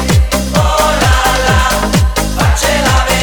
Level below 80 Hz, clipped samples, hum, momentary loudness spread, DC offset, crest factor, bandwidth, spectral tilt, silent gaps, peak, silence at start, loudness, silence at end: -16 dBFS; under 0.1%; none; 3 LU; under 0.1%; 10 dB; over 20 kHz; -4 dB/octave; none; 0 dBFS; 0 s; -11 LUFS; 0 s